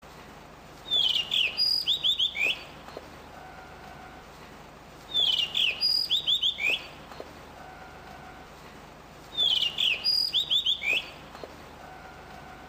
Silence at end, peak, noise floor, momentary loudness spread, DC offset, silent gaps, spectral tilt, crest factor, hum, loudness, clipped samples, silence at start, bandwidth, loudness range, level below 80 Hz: 0 s; -14 dBFS; -48 dBFS; 23 LU; under 0.1%; none; -1 dB/octave; 16 dB; none; -24 LUFS; under 0.1%; 0.05 s; 15.5 kHz; 5 LU; -58 dBFS